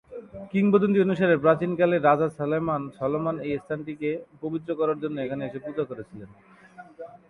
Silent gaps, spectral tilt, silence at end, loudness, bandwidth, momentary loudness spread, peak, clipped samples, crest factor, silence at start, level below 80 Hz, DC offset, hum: none; -9 dB/octave; 0.15 s; -25 LUFS; 10 kHz; 17 LU; -6 dBFS; under 0.1%; 20 dB; 0.1 s; -62 dBFS; under 0.1%; none